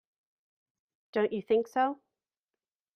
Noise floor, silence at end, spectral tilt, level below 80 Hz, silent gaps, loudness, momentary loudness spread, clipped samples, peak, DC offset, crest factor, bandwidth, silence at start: under -90 dBFS; 1 s; -6 dB/octave; -78 dBFS; none; -30 LUFS; 8 LU; under 0.1%; -16 dBFS; under 0.1%; 18 dB; 9.6 kHz; 1.15 s